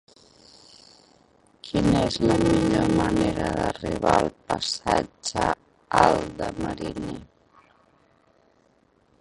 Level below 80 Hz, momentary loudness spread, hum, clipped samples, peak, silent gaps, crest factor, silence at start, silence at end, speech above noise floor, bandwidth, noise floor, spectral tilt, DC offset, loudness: -44 dBFS; 12 LU; none; under 0.1%; -2 dBFS; none; 22 dB; 1.65 s; 1.95 s; 40 dB; 11.5 kHz; -63 dBFS; -5.5 dB/octave; under 0.1%; -24 LUFS